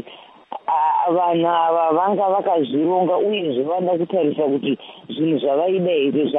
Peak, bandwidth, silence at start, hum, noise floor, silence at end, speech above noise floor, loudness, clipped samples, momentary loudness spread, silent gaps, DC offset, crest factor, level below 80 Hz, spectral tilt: -6 dBFS; 3.9 kHz; 0.05 s; none; -43 dBFS; 0 s; 25 dB; -19 LUFS; under 0.1%; 7 LU; none; under 0.1%; 12 dB; -74 dBFS; -10 dB/octave